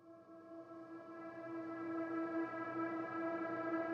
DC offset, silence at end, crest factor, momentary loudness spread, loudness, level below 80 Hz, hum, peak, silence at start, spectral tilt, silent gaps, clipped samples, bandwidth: under 0.1%; 0 s; 14 dB; 14 LU; -44 LUFS; -90 dBFS; none; -30 dBFS; 0 s; -8 dB/octave; none; under 0.1%; 6 kHz